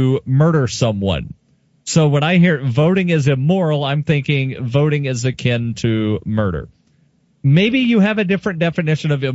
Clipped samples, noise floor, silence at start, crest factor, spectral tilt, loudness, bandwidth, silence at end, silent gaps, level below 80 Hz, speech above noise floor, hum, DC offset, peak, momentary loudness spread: under 0.1%; -57 dBFS; 0 s; 14 dB; -6.5 dB/octave; -16 LUFS; 8 kHz; 0 s; none; -44 dBFS; 42 dB; none; under 0.1%; -2 dBFS; 6 LU